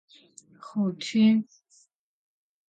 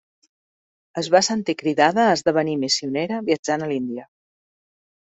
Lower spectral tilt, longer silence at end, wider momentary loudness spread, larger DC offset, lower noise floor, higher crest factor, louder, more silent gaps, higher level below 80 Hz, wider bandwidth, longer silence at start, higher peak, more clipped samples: first, -6 dB/octave vs -4 dB/octave; first, 1.25 s vs 1 s; first, 21 LU vs 11 LU; neither; second, -64 dBFS vs under -90 dBFS; about the same, 16 dB vs 20 dB; second, -25 LUFS vs -21 LUFS; second, none vs 3.39-3.43 s; second, -78 dBFS vs -66 dBFS; about the same, 9 kHz vs 8.2 kHz; second, 0.65 s vs 0.95 s; second, -12 dBFS vs -2 dBFS; neither